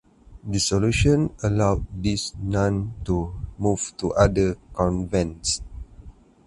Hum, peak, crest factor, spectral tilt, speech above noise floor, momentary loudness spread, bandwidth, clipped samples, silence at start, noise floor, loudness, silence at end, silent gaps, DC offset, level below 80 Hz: none; -2 dBFS; 20 dB; -5.5 dB/octave; 23 dB; 9 LU; 11.5 kHz; under 0.1%; 0.3 s; -46 dBFS; -23 LUFS; 0.35 s; none; under 0.1%; -36 dBFS